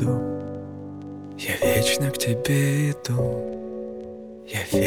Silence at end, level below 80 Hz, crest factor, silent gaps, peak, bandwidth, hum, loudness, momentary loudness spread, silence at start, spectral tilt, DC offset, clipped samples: 0 s; -52 dBFS; 16 dB; none; -8 dBFS; over 20 kHz; none; -24 LUFS; 17 LU; 0 s; -5 dB/octave; under 0.1%; under 0.1%